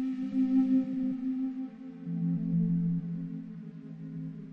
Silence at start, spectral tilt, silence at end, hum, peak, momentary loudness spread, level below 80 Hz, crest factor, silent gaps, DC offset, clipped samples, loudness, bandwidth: 0 s; -11 dB/octave; 0 s; none; -18 dBFS; 16 LU; -68 dBFS; 14 dB; none; under 0.1%; under 0.1%; -31 LUFS; 4.1 kHz